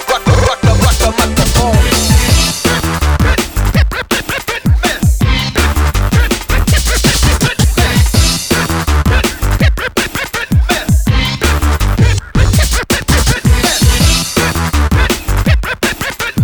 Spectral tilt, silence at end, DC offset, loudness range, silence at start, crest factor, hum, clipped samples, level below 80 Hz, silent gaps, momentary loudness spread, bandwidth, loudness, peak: -4 dB/octave; 0 s; under 0.1%; 2 LU; 0 s; 10 dB; none; under 0.1%; -14 dBFS; none; 4 LU; over 20 kHz; -12 LUFS; 0 dBFS